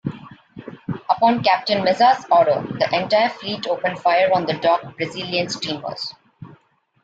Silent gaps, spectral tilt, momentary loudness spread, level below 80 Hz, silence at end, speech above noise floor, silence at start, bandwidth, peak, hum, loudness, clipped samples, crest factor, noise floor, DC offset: none; -5 dB/octave; 15 LU; -62 dBFS; 0.5 s; 36 dB; 0.05 s; 8 kHz; -4 dBFS; none; -19 LUFS; under 0.1%; 16 dB; -55 dBFS; under 0.1%